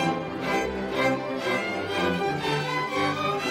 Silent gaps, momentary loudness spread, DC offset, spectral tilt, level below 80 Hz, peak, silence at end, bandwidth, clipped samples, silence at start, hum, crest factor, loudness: none; 3 LU; under 0.1%; -5 dB/octave; -54 dBFS; -12 dBFS; 0 s; 16 kHz; under 0.1%; 0 s; none; 16 dB; -26 LUFS